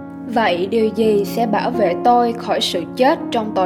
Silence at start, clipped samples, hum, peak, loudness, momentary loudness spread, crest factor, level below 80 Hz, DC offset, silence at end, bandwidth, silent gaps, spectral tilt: 0 s; under 0.1%; none; -2 dBFS; -17 LUFS; 5 LU; 16 dB; -60 dBFS; under 0.1%; 0 s; 18.5 kHz; none; -5 dB/octave